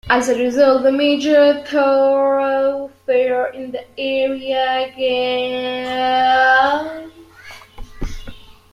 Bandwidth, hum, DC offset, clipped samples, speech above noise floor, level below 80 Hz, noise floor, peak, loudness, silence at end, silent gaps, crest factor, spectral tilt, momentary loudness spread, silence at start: 12 kHz; none; under 0.1%; under 0.1%; 24 dB; -40 dBFS; -40 dBFS; -2 dBFS; -16 LUFS; 0.2 s; none; 14 dB; -4 dB/octave; 16 LU; 0.05 s